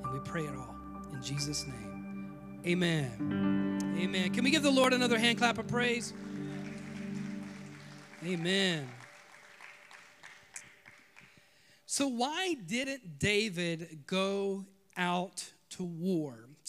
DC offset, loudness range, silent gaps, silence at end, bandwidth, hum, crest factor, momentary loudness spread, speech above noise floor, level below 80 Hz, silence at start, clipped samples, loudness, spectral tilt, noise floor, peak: under 0.1%; 8 LU; none; 0 s; 15.5 kHz; none; 22 dB; 21 LU; 32 dB; -64 dBFS; 0 s; under 0.1%; -33 LUFS; -4.5 dB/octave; -64 dBFS; -12 dBFS